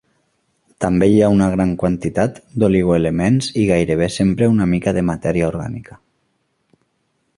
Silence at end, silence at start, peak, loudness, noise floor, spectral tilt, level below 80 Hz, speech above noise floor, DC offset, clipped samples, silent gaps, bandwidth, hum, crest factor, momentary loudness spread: 1.55 s; 0.8 s; -2 dBFS; -17 LUFS; -67 dBFS; -7 dB/octave; -40 dBFS; 51 dB; under 0.1%; under 0.1%; none; 11.5 kHz; none; 16 dB; 8 LU